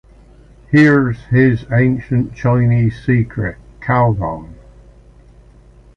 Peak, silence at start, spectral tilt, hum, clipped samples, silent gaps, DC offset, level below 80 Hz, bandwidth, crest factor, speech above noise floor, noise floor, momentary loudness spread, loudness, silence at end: -2 dBFS; 0.7 s; -9 dB/octave; none; under 0.1%; none; under 0.1%; -38 dBFS; 6.6 kHz; 14 dB; 30 dB; -44 dBFS; 12 LU; -15 LUFS; 1.45 s